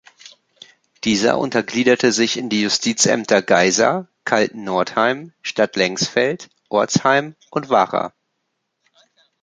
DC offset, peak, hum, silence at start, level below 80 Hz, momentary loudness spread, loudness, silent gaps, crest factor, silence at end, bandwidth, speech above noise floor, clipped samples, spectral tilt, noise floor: under 0.1%; -2 dBFS; none; 1.05 s; -60 dBFS; 10 LU; -18 LUFS; none; 18 dB; 1.35 s; 9.6 kHz; 56 dB; under 0.1%; -3 dB/octave; -74 dBFS